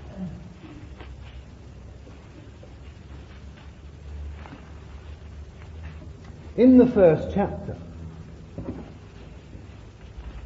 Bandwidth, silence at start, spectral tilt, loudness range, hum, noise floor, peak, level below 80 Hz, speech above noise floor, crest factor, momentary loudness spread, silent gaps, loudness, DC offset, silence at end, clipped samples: 7.2 kHz; 0 s; -9 dB/octave; 22 LU; none; -44 dBFS; -4 dBFS; -44 dBFS; 26 dB; 22 dB; 26 LU; none; -21 LUFS; under 0.1%; 0.05 s; under 0.1%